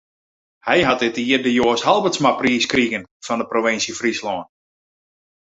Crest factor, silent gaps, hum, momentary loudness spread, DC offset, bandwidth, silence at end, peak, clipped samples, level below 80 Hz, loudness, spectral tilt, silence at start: 18 dB; 3.11-3.20 s; none; 10 LU; under 0.1%; 8 kHz; 1.05 s; -2 dBFS; under 0.1%; -54 dBFS; -18 LUFS; -3.5 dB/octave; 0.65 s